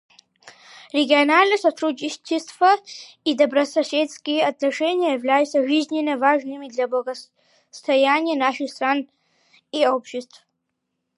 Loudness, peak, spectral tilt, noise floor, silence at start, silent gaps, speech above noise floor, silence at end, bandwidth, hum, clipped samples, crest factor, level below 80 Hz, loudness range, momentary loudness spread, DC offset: -20 LUFS; -2 dBFS; -2.5 dB/octave; -77 dBFS; 0.45 s; none; 57 dB; 0.95 s; 11.5 kHz; none; under 0.1%; 20 dB; -80 dBFS; 3 LU; 12 LU; under 0.1%